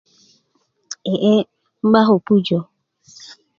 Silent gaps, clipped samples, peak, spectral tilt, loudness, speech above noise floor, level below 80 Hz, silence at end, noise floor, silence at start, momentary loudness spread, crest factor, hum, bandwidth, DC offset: none; under 0.1%; 0 dBFS; -6.5 dB/octave; -17 LUFS; 51 dB; -64 dBFS; 0.25 s; -66 dBFS; 0.9 s; 20 LU; 18 dB; none; 7.4 kHz; under 0.1%